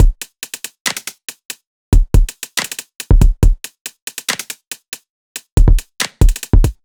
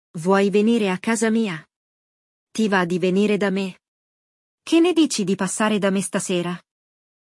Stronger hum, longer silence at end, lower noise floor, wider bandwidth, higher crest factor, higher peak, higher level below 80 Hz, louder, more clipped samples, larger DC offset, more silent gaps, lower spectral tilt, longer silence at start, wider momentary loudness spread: neither; second, 0.1 s vs 0.8 s; second, -31 dBFS vs under -90 dBFS; first, 19 kHz vs 12 kHz; about the same, 14 dB vs 16 dB; first, 0 dBFS vs -6 dBFS; first, -16 dBFS vs -72 dBFS; about the same, -18 LUFS vs -20 LUFS; first, 0.3% vs under 0.1%; neither; second, 0.80-0.85 s, 1.45-1.49 s, 1.67-1.92 s, 3.81-3.85 s, 4.02-4.07 s, 4.88-4.92 s, 5.10-5.35 s, 5.52-5.57 s vs 1.76-2.47 s, 3.88-4.58 s; about the same, -4.5 dB/octave vs -5 dB/octave; second, 0 s vs 0.15 s; first, 17 LU vs 11 LU